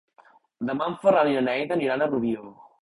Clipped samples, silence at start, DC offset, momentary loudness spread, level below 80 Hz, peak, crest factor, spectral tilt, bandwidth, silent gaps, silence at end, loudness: under 0.1%; 0.6 s; under 0.1%; 10 LU; -64 dBFS; -8 dBFS; 18 dB; -7 dB/octave; 11 kHz; none; 0.3 s; -24 LUFS